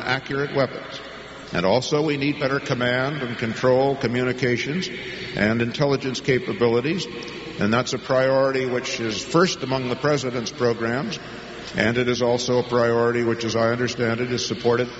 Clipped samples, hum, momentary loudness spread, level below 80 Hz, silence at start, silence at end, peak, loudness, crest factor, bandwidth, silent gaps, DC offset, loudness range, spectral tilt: under 0.1%; none; 9 LU; -54 dBFS; 0 s; 0 s; -4 dBFS; -22 LUFS; 18 dB; 8 kHz; none; under 0.1%; 2 LU; -4 dB/octave